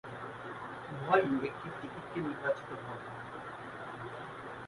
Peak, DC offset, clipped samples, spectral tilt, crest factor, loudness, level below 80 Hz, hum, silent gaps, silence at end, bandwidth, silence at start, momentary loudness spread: -14 dBFS; under 0.1%; under 0.1%; -7 dB/octave; 24 dB; -37 LUFS; -68 dBFS; none; none; 0 s; 11.5 kHz; 0.05 s; 15 LU